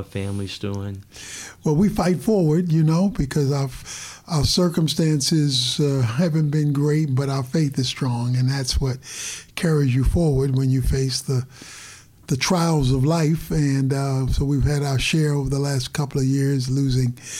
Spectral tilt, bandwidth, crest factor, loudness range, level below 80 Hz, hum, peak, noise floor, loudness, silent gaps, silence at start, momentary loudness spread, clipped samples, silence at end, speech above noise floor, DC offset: -5.5 dB/octave; 15.5 kHz; 12 dB; 2 LU; -34 dBFS; none; -8 dBFS; -44 dBFS; -21 LUFS; none; 0 s; 10 LU; under 0.1%; 0 s; 23 dB; under 0.1%